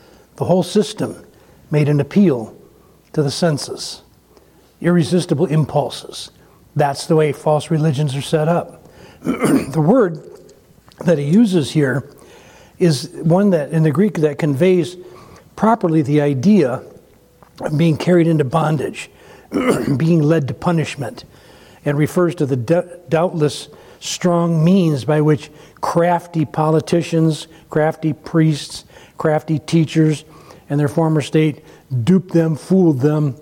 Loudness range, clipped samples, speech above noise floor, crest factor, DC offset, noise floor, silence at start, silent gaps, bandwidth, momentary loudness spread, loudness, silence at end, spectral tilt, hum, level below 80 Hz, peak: 3 LU; under 0.1%; 34 dB; 14 dB; under 0.1%; -50 dBFS; 0.4 s; none; 16 kHz; 12 LU; -17 LUFS; 0.05 s; -7 dB/octave; none; -54 dBFS; -4 dBFS